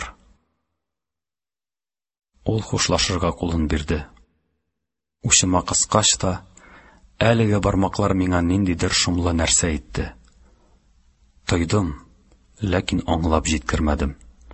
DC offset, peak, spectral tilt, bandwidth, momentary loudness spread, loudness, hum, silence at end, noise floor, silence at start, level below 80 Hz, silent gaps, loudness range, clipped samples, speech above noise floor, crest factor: under 0.1%; 0 dBFS; -4 dB/octave; 8.6 kHz; 13 LU; -20 LUFS; none; 0 s; under -90 dBFS; 0 s; -34 dBFS; none; 6 LU; under 0.1%; over 70 dB; 22 dB